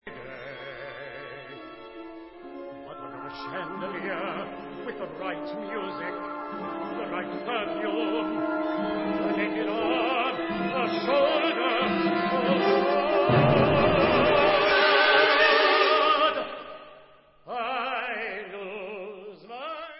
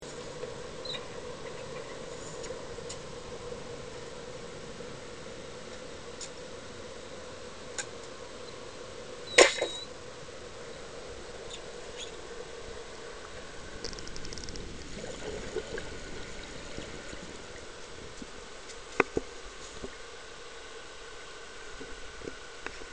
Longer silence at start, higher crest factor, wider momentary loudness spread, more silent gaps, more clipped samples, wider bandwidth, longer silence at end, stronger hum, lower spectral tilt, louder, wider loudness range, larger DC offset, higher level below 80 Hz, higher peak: about the same, 0.05 s vs 0 s; second, 20 dB vs 36 dB; first, 21 LU vs 7 LU; neither; neither; second, 5.8 kHz vs 10.5 kHz; about the same, 0 s vs 0 s; neither; first, -9.5 dB/octave vs -2.5 dB/octave; first, -25 LUFS vs -37 LUFS; first, 16 LU vs 13 LU; second, under 0.1% vs 0.3%; about the same, -54 dBFS vs -54 dBFS; second, -6 dBFS vs -2 dBFS